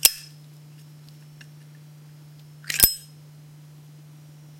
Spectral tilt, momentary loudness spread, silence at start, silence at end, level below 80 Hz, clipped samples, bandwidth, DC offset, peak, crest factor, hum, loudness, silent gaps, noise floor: -0.5 dB/octave; 29 LU; 0.05 s; 1.6 s; -50 dBFS; under 0.1%; 16.5 kHz; under 0.1%; 0 dBFS; 30 dB; none; -20 LUFS; none; -47 dBFS